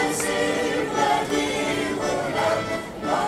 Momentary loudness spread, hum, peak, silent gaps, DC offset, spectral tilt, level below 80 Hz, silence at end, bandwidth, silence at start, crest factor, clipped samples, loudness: 4 LU; none; -8 dBFS; none; under 0.1%; -3.5 dB/octave; -50 dBFS; 0 s; 16 kHz; 0 s; 14 dB; under 0.1%; -23 LUFS